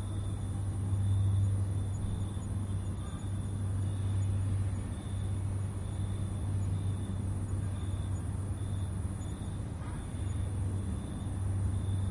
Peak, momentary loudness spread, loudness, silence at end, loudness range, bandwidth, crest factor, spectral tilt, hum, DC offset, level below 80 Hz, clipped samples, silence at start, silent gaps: -22 dBFS; 6 LU; -35 LUFS; 0 s; 3 LU; 11.5 kHz; 12 dB; -7 dB/octave; none; under 0.1%; -44 dBFS; under 0.1%; 0 s; none